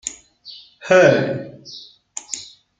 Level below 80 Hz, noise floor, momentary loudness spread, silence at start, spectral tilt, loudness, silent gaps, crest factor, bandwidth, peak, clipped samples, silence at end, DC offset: -62 dBFS; -43 dBFS; 26 LU; 0.05 s; -4.5 dB/octave; -16 LUFS; none; 18 dB; 9.4 kHz; -2 dBFS; under 0.1%; 0.35 s; under 0.1%